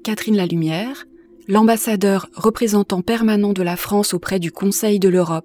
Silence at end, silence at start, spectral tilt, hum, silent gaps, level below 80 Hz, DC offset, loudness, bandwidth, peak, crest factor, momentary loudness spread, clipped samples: 0.05 s; 0.05 s; -5 dB/octave; none; none; -52 dBFS; under 0.1%; -18 LUFS; 19.5 kHz; -4 dBFS; 14 dB; 7 LU; under 0.1%